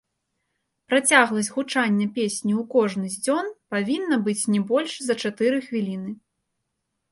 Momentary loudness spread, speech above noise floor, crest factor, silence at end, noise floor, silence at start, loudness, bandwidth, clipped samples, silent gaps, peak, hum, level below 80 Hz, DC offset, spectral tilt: 10 LU; 56 dB; 20 dB; 0.95 s; -78 dBFS; 0.9 s; -23 LUFS; 11.5 kHz; under 0.1%; none; -4 dBFS; none; -72 dBFS; under 0.1%; -4 dB/octave